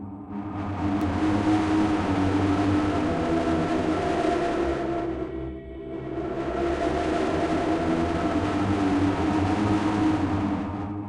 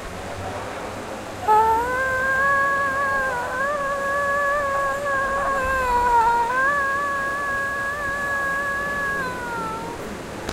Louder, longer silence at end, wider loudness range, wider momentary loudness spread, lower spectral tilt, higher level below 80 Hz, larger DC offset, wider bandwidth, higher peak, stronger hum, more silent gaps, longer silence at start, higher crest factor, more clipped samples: second, -25 LUFS vs -22 LUFS; about the same, 0 s vs 0 s; about the same, 4 LU vs 3 LU; second, 9 LU vs 13 LU; first, -7 dB/octave vs -4 dB/octave; about the same, -42 dBFS vs -44 dBFS; neither; second, 10.5 kHz vs 16 kHz; second, -12 dBFS vs -8 dBFS; neither; neither; about the same, 0 s vs 0 s; about the same, 12 dB vs 16 dB; neither